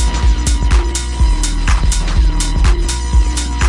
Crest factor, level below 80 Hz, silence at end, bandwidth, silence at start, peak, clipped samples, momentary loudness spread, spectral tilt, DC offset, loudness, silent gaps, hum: 10 dB; -12 dBFS; 0 s; 11.5 kHz; 0 s; -2 dBFS; under 0.1%; 2 LU; -4 dB/octave; under 0.1%; -16 LUFS; none; none